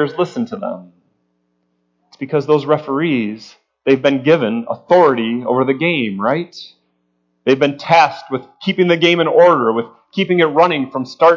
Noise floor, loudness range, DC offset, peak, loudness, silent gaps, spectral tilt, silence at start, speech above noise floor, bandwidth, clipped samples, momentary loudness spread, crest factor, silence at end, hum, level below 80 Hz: -66 dBFS; 6 LU; under 0.1%; 0 dBFS; -15 LUFS; none; -6.5 dB/octave; 0 s; 51 dB; 7.4 kHz; under 0.1%; 14 LU; 16 dB; 0 s; none; -66 dBFS